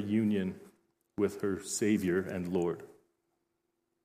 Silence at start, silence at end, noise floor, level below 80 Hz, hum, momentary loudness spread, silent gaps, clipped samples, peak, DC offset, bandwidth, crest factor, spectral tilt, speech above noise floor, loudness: 0 s; 1.15 s; -81 dBFS; -70 dBFS; none; 12 LU; none; under 0.1%; -18 dBFS; under 0.1%; 15.5 kHz; 16 dB; -5.5 dB/octave; 50 dB; -33 LUFS